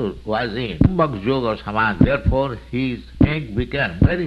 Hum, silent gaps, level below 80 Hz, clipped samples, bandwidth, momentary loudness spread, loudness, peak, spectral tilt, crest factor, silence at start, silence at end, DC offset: none; none; -30 dBFS; under 0.1%; 6.8 kHz; 7 LU; -20 LUFS; -2 dBFS; -9 dB/octave; 18 dB; 0 s; 0 s; under 0.1%